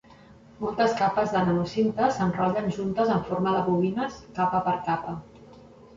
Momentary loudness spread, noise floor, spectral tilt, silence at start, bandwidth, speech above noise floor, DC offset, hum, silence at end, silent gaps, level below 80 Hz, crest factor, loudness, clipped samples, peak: 8 LU; -51 dBFS; -7 dB/octave; 0.3 s; 7.6 kHz; 26 dB; under 0.1%; none; 0 s; none; -56 dBFS; 16 dB; -26 LUFS; under 0.1%; -10 dBFS